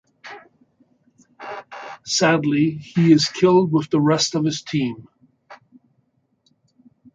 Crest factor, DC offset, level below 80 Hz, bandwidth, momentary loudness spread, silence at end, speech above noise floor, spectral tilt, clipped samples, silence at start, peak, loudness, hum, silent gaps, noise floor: 18 dB; under 0.1%; -62 dBFS; 9.4 kHz; 23 LU; 1.6 s; 48 dB; -5 dB/octave; under 0.1%; 0.25 s; -2 dBFS; -18 LUFS; none; none; -66 dBFS